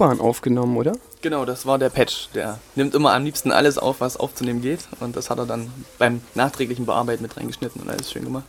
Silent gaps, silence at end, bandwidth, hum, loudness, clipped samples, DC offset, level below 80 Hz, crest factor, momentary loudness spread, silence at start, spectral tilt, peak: none; 0 s; 17.5 kHz; none; -22 LUFS; under 0.1%; under 0.1%; -52 dBFS; 22 dB; 11 LU; 0 s; -5 dB/octave; 0 dBFS